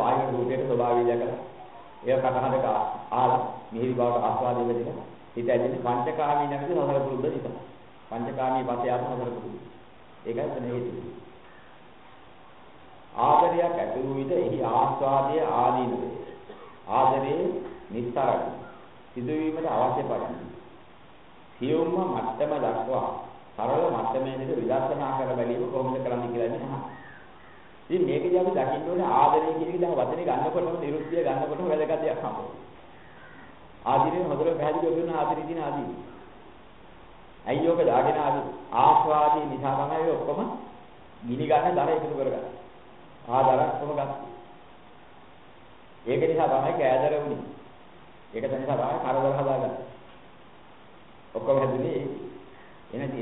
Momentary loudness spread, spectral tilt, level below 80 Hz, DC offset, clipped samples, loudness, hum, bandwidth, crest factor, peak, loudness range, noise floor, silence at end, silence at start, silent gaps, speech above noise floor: 17 LU; -11 dB/octave; -62 dBFS; 0.3%; under 0.1%; -26 LUFS; none; 4.1 kHz; 22 dB; -6 dBFS; 6 LU; -52 dBFS; 0 s; 0 s; none; 26 dB